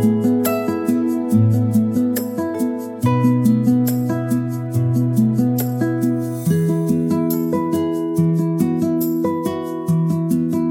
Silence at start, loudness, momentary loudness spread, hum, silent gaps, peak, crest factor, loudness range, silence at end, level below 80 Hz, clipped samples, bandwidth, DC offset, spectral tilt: 0 s; -18 LUFS; 6 LU; none; none; -4 dBFS; 14 dB; 2 LU; 0 s; -58 dBFS; under 0.1%; 17 kHz; under 0.1%; -8 dB/octave